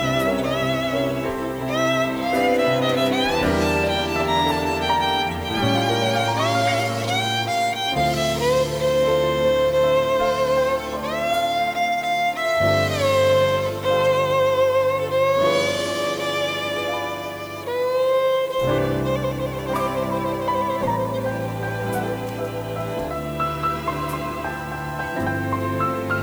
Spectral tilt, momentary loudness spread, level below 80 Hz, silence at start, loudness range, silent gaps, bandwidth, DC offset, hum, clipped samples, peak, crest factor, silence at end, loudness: -5 dB/octave; 8 LU; -44 dBFS; 0 s; 6 LU; none; over 20 kHz; under 0.1%; none; under 0.1%; -8 dBFS; 14 dB; 0 s; -21 LUFS